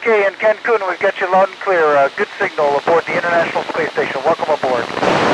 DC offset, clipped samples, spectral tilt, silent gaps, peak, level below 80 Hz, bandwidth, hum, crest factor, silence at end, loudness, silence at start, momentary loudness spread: under 0.1%; under 0.1%; -4.5 dB/octave; none; -2 dBFS; -56 dBFS; 10.5 kHz; none; 14 dB; 0 s; -16 LUFS; 0 s; 5 LU